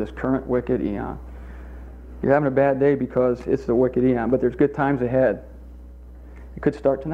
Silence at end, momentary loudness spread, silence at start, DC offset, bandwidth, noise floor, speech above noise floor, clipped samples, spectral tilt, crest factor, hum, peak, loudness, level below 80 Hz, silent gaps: 0 s; 21 LU; 0 s; under 0.1%; 7.4 kHz; -41 dBFS; 20 dB; under 0.1%; -9.5 dB/octave; 18 dB; none; -6 dBFS; -21 LUFS; -40 dBFS; none